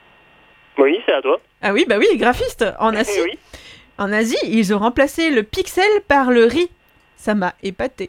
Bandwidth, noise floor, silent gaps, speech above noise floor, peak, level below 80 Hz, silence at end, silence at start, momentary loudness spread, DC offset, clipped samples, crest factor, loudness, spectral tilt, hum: 16.5 kHz; -50 dBFS; none; 33 dB; 0 dBFS; -44 dBFS; 0 s; 0.75 s; 10 LU; under 0.1%; under 0.1%; 18 dB; -17 LUFS; -4.5 dB/octave; none